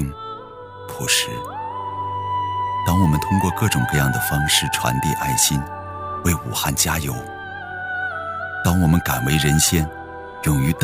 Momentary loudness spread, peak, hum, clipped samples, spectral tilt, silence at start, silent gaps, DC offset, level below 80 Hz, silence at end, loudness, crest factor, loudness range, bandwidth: 14 LU; -4 dBFS; none; under 0.1%; -3.5 dB/octave; 0 s; none; under 0.1%; -36 dBFS; 0 s; -20 LUFS; 18 dB; 4 LU; 16 kHz